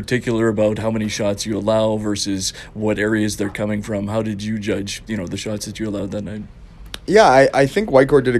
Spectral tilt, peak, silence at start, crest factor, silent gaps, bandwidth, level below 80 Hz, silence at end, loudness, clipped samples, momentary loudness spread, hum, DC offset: -5 dB/octave; 0 dBFS; 0 s; 18 dB; none; 14 kHz; -42 dBFS; 0 s; -19 LUFS; under 0.1%; 13 LU; none; under 0.1%